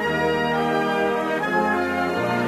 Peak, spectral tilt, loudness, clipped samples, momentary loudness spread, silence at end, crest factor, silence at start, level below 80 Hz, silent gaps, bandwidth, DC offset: -8 dBFS; -5.5 dB/octave; -22 LUFS; under 0.1%; 2 LU; 0 s; 14 dB; 0 s; -52 dBFS; none; 15 kHz; under 0.1%